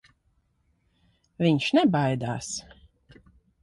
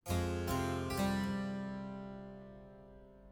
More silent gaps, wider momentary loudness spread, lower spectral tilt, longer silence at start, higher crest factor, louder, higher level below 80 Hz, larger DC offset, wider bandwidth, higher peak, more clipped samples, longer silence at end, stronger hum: neither; second, 12 LU vs 21 LU; about the same, -5.5 dB/octave vs -6 dB/octave; first, 1.4 s vs 0.05 s; about the same, 18 dB vs 16 dB; first, -25 LUFS vs -38 LUFS; second, -60 dBFS vs -54 dBFS; neither; second, 11.5 kHz vs over 20 kHz; first, -10 dBFS vs -24 dBFS; neither; first, 1 s vs 0 s; neither